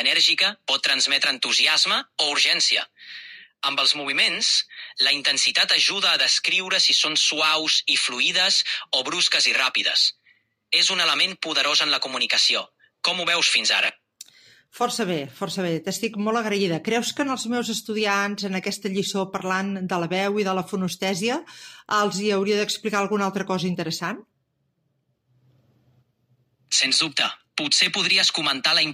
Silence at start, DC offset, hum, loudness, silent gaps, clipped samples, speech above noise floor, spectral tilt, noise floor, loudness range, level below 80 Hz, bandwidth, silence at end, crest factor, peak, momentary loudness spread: 0 s; under 0.1%; none; -20 LUFS; none; under 0.1%; 50 dB; -1.5 dB/octave; -72 dBFS; 7 LU; -76 dBFS; 15.5 kHz; 0 s; 18 dB; -6 dBFS; 10 LU